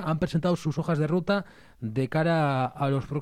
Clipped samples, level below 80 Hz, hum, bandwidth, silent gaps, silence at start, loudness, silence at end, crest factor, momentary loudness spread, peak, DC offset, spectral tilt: under 0.1%; -54 dBFS; none; 12 kHz; none; 0 s; -27 LUFS; 0 s; 12 dB; 7 LU; -14 dBFS; under 0.1%; -7.5 dB/octave